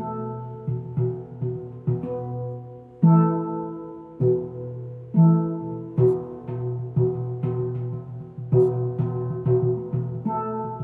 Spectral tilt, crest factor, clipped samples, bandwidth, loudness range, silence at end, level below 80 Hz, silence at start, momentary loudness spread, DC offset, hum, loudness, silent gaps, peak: -13.5 dB/octave; 18 dB; under 0.1%; 2.7 kHz; 3 LU; 0 s; -58 dBFS; 0 s; 15 LU; under 0.1%; none; -25 LUFS; none; -6 dBFS